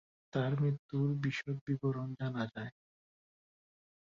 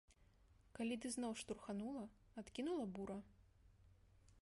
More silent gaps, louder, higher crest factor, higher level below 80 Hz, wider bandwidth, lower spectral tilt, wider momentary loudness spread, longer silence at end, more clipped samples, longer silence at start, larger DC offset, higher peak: first, 0.79-0.89 s, 1.61-1.67 s vs none; first, -37 LUFS vs -48 LUFS; about the same, 18 dB vs 16 dB; about the same, -72 dBFS vs -72 dBFS; second, 7.2 kHz vs 11.5 kHz; first, -7 dB/octave vs -4.5 dB/octave; second, 7 LU vs 11 LU; first, 1.35 s vs 0 s; neither; first, 0.35 s vs 0.1 s; neither; first, -20 dBFS vs -34 dBFS